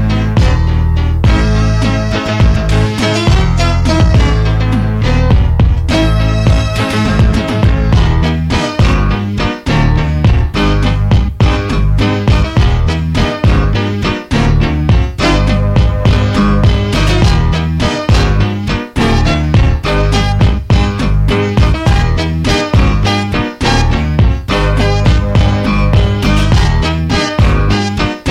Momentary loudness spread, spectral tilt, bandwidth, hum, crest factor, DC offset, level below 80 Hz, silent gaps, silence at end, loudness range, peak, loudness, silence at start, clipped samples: 3 LU; -6.5 dB/octave; 11.5 kHz; none; 10 dB; under 0.1%; -14 dBFS; none; 0 s; 1 LU; 0 dBFS; -12 LUFS; 0 s; under 0.1%